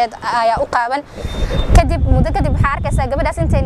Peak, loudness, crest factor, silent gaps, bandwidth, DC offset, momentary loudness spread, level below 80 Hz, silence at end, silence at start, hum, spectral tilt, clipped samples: 0 dBFS; -16 LUFS; 14 dB; none; 12.5 kHz; under 0.1%; 7 LU; -18 dBFS; 0 s; 0 s; none; -6.5 dB/octave; under 0.1%